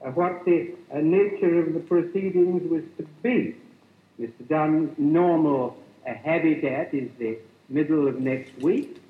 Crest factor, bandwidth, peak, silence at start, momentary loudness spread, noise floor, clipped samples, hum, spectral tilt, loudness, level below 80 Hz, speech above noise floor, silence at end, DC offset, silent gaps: 14 dB; 4.6 kHz; -10 dBFS; 0 s; 12 LU; -56 dBFS; under 0.1%; none; -9.5 dB/octave; -24 LUFS; -80 dBFS; 32 dB; 0.15 s; under 0.1%; none